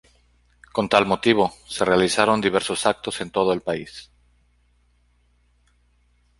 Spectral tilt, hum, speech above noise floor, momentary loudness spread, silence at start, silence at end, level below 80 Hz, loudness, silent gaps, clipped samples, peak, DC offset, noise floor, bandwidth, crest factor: -4 dB/octave; 60 Hz at -55 dBFS; 41 dB; 11 LU; 0.75 s; 2.35 s; -54 dBFS; -21 LUFS; none; under 0.1%; -2 dBFS; under 0.1%; -62 dBFS; 11.5 kHz; 22 dB